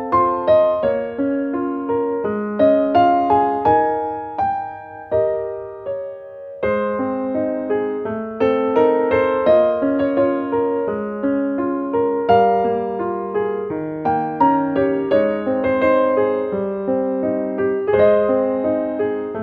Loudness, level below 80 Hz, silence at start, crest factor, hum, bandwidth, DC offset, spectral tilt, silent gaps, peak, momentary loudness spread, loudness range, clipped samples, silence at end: -19 LUFS; -52 dBFS; 0 s; 16 dB; none; 5.2 kHz; under 0.1%; -9 dB/octave; none; -2 dBFS; 9 LU; 5 LU; under 0.1%; 0 s